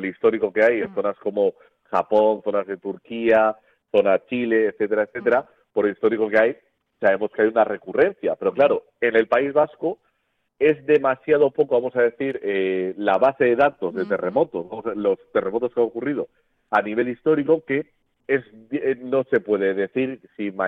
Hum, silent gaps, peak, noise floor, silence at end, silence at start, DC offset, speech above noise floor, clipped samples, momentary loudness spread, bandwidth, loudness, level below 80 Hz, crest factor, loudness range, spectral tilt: none; none; -4 dBFS; -72 dBFS; 0 s; 0 s; under 0.1%; 51 dB; under 0.1%; 8 LU; 4.9 kHz; -21 LUFS; -64 dBFS; 16 dB; 3 LU; -8 dB/octave